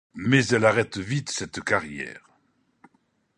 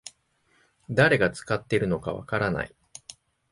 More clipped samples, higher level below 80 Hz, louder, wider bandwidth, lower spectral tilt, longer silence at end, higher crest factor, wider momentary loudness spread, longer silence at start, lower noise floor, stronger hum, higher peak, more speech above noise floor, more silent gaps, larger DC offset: neither; second, -58 dBFS vs -52 dBFS; about the same, -24 LUFS vs -25 LUFS; about the same, 11 kHz vs 11.5 kHz; about the same, -5 dB/octave vs -5.5 dB/octave; first, 1.2 s vs 0.4 s; about the same, 22 dB vs 20 dB; second, 14 LU vs 24 LU; about the same, 0.15 s vs 0.05 s; about the same, -68 dBFS vs -67 dBFS; neither; about the same, -4 dBFS vs -6 dBFS; about the same, 44 dB vs 42 dB; neither; neither